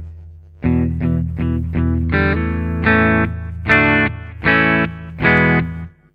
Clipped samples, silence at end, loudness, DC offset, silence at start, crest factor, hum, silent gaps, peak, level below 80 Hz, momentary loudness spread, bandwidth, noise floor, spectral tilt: under 0.1%; 0.25 s; -16 LUFS; under 0.1%; 0 s; 16 dB; none; none; 0 dBFS; -30 dBFS; 10 LU; 6 kHz; -38 dBFS; -8.5 dB/octave